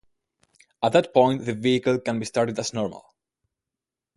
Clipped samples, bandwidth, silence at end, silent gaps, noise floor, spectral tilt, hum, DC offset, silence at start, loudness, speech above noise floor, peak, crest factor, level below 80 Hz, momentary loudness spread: under 0.1%; 11.5 kHz; 1.15 s; none; -88 dBFS; -5.5 dB/octave; none; under 0.1%; 0.8 s; -23 LUFS; 66 dB; -4 dBFS; 20 dB; -62 dBFS; 8 LU